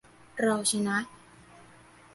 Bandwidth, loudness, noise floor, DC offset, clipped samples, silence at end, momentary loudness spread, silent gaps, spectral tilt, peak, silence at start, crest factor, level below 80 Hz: 12 kHz; -28 LUFS; -55 dBFS; under 0.1%; under 0.1%; 0.55 s; 17 LU; none; -3 dB/octave; -12 dBFS; 0.35 s; 20 dB; -68 dBFS